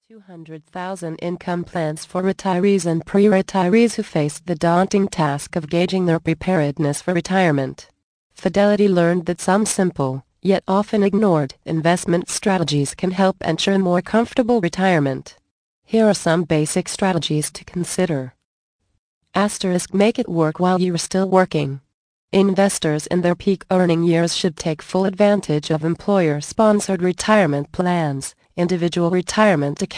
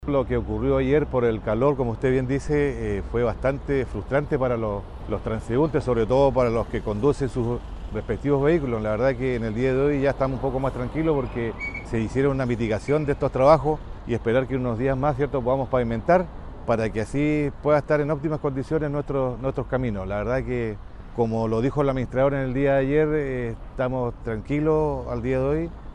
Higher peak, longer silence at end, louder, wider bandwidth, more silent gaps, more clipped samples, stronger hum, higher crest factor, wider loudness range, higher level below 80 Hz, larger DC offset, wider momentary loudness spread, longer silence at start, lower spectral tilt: about the same, -2 dBFS vs -4 dBFS; about the same, 0 s vs 0 s; first, -19 LUFS vs -24 LUFS; about the same, 10.5 kHz vs 10.5 kHz; first, 8.03-8.30 s, 15.51-15.82 s, 18.45-18.79 s, 18.98-19.21 s, 21.94-22.28 s vs none; neither; neither; about the same, 16 dB vs 20 dB; about the same, 3 LU vs 3 LU; second, -52 dBFS vs -36 dBFS; neither; about the same, 8 LU vs 8 LU; first, 0.15 s vs 0 s; second, -5.5 dB/octave vs -8 dB/octave